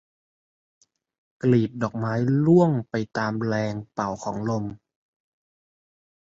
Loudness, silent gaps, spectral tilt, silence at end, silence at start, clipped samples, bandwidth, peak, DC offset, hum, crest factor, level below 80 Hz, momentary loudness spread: -24 LUFS; none; -8 dB/octave; 1.55 s; 1.45 s; under 0.1%; 7.8 kHz; -8 dBFS; under 0.1%; none; 18 dB; -60 dBFS; 11 LU